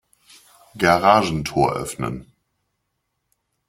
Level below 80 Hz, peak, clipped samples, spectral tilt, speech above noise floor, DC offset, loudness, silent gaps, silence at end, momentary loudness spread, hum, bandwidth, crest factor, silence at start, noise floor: -48 dBFS; 0 dBFS; under 0.1%; -5 dB/octave; 56 dB; under 0.1%; -19 LUFS; none; 1.45 s; 14 LU; none; 16.5 kHz; 22 dB; 0.75 s; -75 dBFS